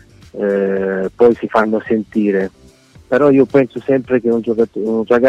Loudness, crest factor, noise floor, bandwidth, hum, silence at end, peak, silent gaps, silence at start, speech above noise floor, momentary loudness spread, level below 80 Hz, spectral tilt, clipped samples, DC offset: -15 LUFS; 14 dB; -44 dBFS; 8.2 kHz; none; 0 s; -2 dBFS; none; 0.35 s; 31 dB; 7 LU; -52 dBFS; -8.5 dB/octave; under 0.1%; under 0.1%